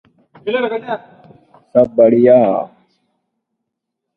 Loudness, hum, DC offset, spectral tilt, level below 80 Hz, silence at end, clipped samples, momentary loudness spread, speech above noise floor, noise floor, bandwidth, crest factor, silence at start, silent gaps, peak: -13 LUFS; none; under 0.1%; -9.5 dB/octave; -58 dBFS; 1.5 s; under 0.1%; 17 LU; 65 dB; -77 dBFS; 4.2 kHz; 16 dB; 0.45 s; none; 0 dBFS